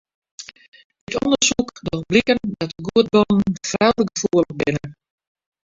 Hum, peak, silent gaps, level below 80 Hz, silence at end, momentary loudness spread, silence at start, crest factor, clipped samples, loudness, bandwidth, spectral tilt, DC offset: none; -2 dBFS; 0.68-0.72 s, 0.85-0.90 s, 1.01-1.07 s; -50 dBFS; 0.75 s; 18 LU; 0.4 s; 18 dB; under 0.1%; -19 LUFS; 7.8 kHz; -4 dB/octave; under 0.1%